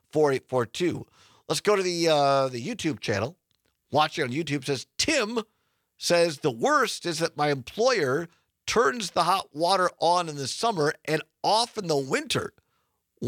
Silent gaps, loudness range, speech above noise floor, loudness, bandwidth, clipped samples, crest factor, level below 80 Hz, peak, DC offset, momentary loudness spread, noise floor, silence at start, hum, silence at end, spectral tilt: none; 2 LU; 49 dB; -26 LUFS; 17.5 kHz; under 0.1%; 20 dB; -66 dBFS; -8 dBFS; under 0.1%; 7 LU; -75 dBFS; 0.15 s; none; 0 s; -4 dB/octave